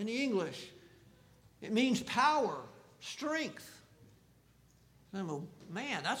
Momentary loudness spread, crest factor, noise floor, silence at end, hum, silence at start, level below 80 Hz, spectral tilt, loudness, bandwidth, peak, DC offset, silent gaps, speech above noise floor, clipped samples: 20 LU; 20 dB; -66 dBFS; 0 s; none; 0 s; -74 dBFS; -4 dB/octave; -35 LUFS; 16.5 kHz; -18 dBFS; under 0.1%; none; 31 dB; under 0.1%